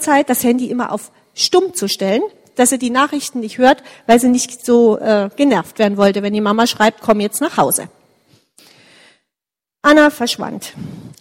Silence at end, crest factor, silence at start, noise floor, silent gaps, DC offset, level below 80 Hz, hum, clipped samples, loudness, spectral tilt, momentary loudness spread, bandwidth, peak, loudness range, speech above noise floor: 0.1 s; 16 dB; 0 s; -88 dBFS; none; under 0.1%; -54 dBFS; none; under 0.1%; -15 LUFS; -3.5 dB/octave; 11 LU; 16.5 kHz; 0 dBFS; 4 LU; 73 dB